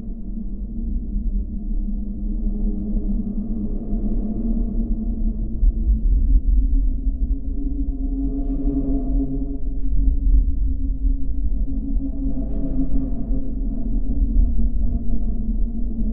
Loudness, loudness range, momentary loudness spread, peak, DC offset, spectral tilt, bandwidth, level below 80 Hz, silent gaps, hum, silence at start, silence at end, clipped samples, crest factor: -25 LUFS; 3 LU; 7 LU; -4 dBFS; under 0.1%; -15 dB/octave; 0.9 kHz; -20 dBFS; none; none; 0 s; 0 s; under 0.1%; 14 dB